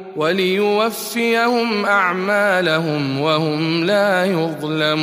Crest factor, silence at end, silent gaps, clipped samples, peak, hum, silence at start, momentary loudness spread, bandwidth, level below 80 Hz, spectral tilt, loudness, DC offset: 14 dB; 0 s; none; under 0.1%; -4 dBFS; none; 0 s; 4 LU; 15.5 kHz; -66 dBFS; -5 dB/octave; -17 LUFS; under 0.1%